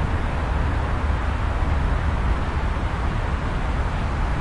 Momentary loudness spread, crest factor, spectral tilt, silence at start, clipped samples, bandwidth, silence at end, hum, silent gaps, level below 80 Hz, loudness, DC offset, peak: 2 LU; 12 dB; -7 dB/octave; 0 s; under 0.1%; 10.5 kHz; 0 s; none; none; -24 dBFS; -25 LUFS; under 0.1%; -10 dBFS